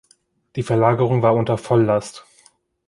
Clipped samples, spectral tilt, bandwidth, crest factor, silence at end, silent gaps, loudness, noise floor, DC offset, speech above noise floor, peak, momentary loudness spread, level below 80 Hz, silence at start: under 0.1%; -7.5 dB/octave; 11.5 kHz; 18 dB; 0.7 s; none; -18 LUFS; -60 dBFS; under 0.1%; 42 dB; -2 dBFS; 13 LU; -54 dBFS; 0.55 s